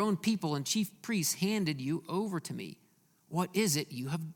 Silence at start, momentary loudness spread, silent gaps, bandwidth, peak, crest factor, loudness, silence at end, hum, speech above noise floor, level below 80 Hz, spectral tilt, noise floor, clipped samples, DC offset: 0 s; 8 LU; none; 18 kHz; -16 dBFS; 18 dB; -33 LUFS; 0 s; none; 32 dB; -74 dBFS; -4.5 dB/octave; -65 dBFS; under 0.1%; under 0.1%